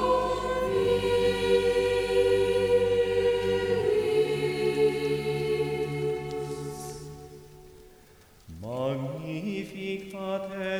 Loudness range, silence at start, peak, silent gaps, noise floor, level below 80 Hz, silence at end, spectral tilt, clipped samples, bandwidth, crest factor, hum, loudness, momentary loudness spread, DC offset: 12 LU; 0 s; -12 dBFS; none; -55 dBFS; -50 dBFS; 0 s; -5.5 dB/octave; under 0.1%; 16 kHz; 16 dB; none; -27 LUFS; 12 LU; under 0.1%